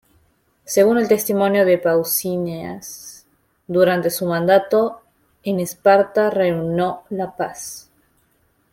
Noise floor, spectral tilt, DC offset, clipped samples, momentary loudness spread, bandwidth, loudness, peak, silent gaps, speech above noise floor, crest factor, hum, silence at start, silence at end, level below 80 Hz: -62 dBFS; -5 dB/octave; under 0.1%; under 0.1%; 16 LU; 16.5 kHz; -18 LUFS; -2 dBFS; none; 45 dB; 18 dB; none; 0.7 s; 0.95 s; -58 dBFS